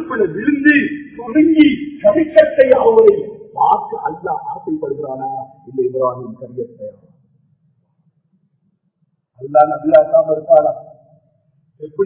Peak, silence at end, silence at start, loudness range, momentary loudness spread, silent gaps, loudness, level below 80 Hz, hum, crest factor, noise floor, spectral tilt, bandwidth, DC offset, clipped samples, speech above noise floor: 0 dBFS; 0 s; 0 s; 13 LU; 19 LU; none; -14 LUFS; -54 dBFS; none; 16 dB; -65 dBFS; -9.5 dB/octave; 4 kHz; under 0.1%; 0.3%; 51 dB